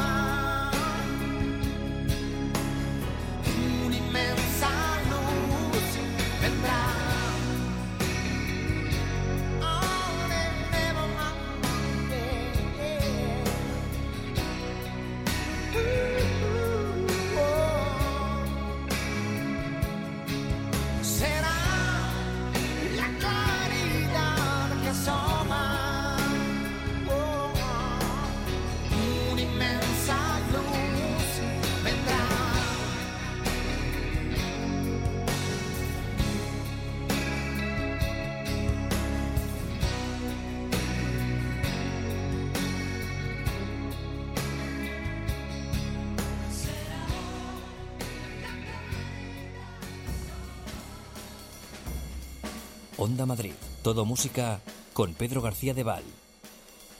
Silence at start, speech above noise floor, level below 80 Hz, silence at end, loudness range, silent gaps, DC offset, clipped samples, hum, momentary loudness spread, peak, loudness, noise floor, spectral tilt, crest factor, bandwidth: 0 s; 22 dB; -38 dBFS; 0 s; 7 LU; none; under 0.1%; under 0.1%; none; 10 LU; -14 dBFS; -29 LUFS; -51 dBFS; -5 dB/octave; 14 dB; 16.5 kHz